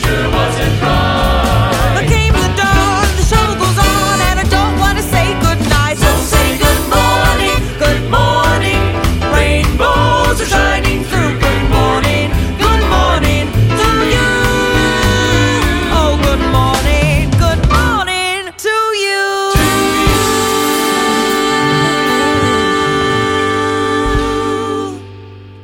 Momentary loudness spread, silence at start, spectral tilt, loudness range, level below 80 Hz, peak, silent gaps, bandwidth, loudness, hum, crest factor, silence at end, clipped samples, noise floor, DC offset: 3 LU; 0 s; -4.5 dB/octave; 1 LU; -18 dBFS; 0 dBFS; none; 17 kHz; -12 LUFS; none; 12 dB; 0 s; under 0.1%; -32 dBFS; under 0.1%